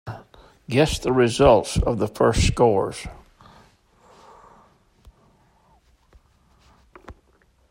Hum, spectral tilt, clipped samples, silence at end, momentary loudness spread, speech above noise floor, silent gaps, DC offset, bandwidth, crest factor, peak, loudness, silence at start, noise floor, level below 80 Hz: none; -5.5 dB/octave; under 0.1%; 0.6 s; 20 LU; 41 dB; none; under 0.1%; 16 kHz; 22 dB; -2 dBFS; -20 LUFS; 0.05 s; -60 dBFS; -36 dBFS